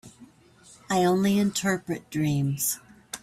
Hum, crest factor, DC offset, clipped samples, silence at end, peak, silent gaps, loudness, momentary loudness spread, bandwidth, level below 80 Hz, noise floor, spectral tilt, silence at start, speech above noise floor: none; 14 dB; under 0.1%; under 0.1%; 0.05 s; -12 dBFS; none; -26 LUFS; 9 LU; 16 kHz; -62 dBFS; -54 dBFS; -5 dB/octave; 0.05 s; 30 dB